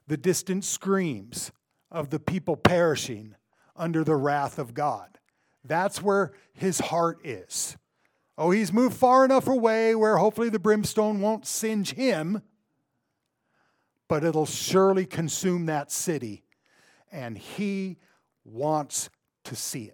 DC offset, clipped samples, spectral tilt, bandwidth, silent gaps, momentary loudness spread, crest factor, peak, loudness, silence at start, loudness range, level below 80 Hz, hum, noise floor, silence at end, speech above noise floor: under 0.1%; under 0.1%; -5 dB/octave; 19 kHz; none; 14 LU; 24 dB; -4 dBFS; -26 LUFS; 0.1 s; 8 LU; -62 dBFS; none; -78 dBFS; 0.05 s; 53 dB